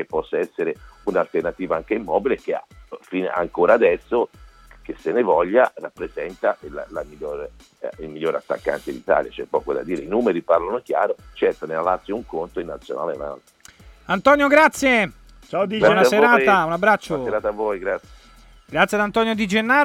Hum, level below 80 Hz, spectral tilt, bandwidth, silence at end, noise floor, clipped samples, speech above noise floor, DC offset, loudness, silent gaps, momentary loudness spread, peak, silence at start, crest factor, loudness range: none; -50 dBFS; -5 dB/octave; 16.5 kHz; 0 s; -48 dBFS; under 0.1%; 28 dB; under 0.1%; -20 LUFS; none; 16 LU; 0 dBFS; 0 s; 20 dB; 9 LU